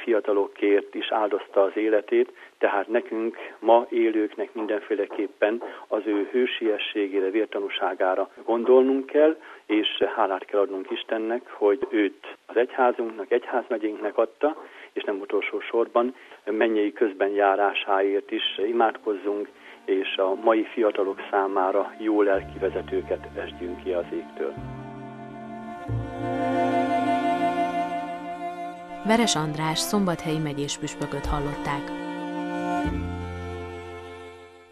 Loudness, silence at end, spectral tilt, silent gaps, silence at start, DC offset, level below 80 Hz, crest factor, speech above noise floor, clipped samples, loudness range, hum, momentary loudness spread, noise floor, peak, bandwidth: -25 LUFS; 0.15 s; -5 dB/octave; none; 0 s; under 0.1%; -48 dBFS; 20 dB; 20 dB; under 0.1%; 6 LU; none; 12 LU; -45 dBFS; -6 dBFS; 13 kHz